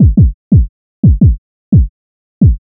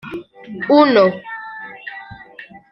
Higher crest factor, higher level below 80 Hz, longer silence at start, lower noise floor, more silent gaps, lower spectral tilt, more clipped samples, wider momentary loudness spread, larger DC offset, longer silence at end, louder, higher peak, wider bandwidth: second, 10 dB vs 16 dB; first, -16 dBFS vs -60 dBFS; about the same, 0 s vs 0.05 s; first, under -90 dBFS vs -40 dBFS; first, 0.34-0.51 s, 0.69-1.03 s, 1.38-1.72 s, 1.89-2.41 s vs none; first, -17.5 dB/octave vs -7.5 dB/octave; neither; second, 11 LU vs 25 LU; neither; about the same, 0.2 s vs 0.3 s; first, -11 LUFS vs -14 LUFS; about the same, 0 dBFS vs -2 dBFS; second, 0.9 kHz vs 6 kHz